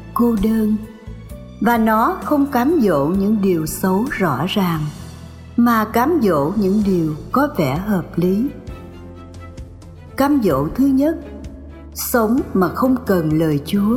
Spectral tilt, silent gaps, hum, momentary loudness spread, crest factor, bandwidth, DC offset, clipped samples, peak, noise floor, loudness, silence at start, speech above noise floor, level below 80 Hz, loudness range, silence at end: -6.5 dB/octave; none; none; 20 LU; 14 dB; 17.5 kHz; under 0.1%; under 0.1%; -4 dBFS; -37 dBFS; -17 LUFS; 0 s; 21 dB; -38 dBFS; 4 LU; 0 s